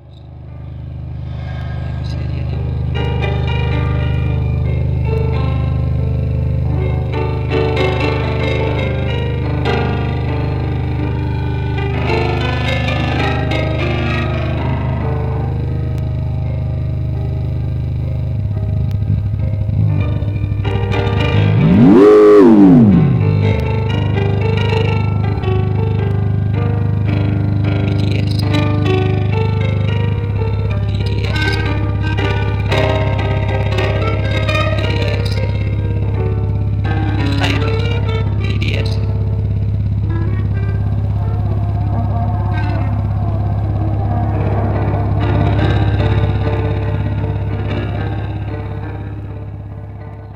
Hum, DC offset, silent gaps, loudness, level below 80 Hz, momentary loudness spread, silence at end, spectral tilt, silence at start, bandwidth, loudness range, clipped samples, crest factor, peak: 50 Hz at -45 dBFS; under 0.1%; none; -16 LUFS; -24 dBFS; 5 LU; 0 s; -8.5 dB/octave; 0.05 s; 7.4 kHz; 8 LU; under 0.1%; 14 dB; 0 dBFS